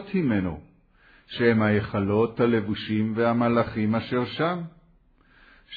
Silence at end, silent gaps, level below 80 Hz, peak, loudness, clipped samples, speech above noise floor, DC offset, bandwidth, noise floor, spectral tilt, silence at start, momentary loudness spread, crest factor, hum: 0 s; none; -54 dBFS; -8 dBFS; -24 LUFS; under 0.1%; 35 dB; under 0.1%; 5 kHz; -59 dBFS; -10 dB/octave; 0 s; 10 LU; 18 dB; none